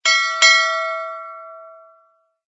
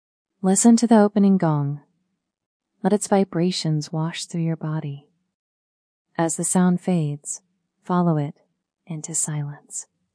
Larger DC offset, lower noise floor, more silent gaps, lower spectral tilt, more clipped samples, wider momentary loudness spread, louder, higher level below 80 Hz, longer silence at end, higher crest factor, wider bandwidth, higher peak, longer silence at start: neither; second, -59 dBFS vs -75 dBFS; second, none vs 2.46-2.60 s, 5.34-6.05 s; second, 5 dB/octave vs -5.5 dB/octave; neither; first, 23 LU vs 18 LU; first, -14 LUFS vs -21 LUFS; second, under -90 dBFS vs -72 dBFS; first, 0.8 s vs 0.3 s; about the same, 20 dB vs 18 dB; second, 8.2 kHz vs 10.5 kHz; first, 0 dBFS vs -4 dBFS; second, 0.05 s vs 0.45 s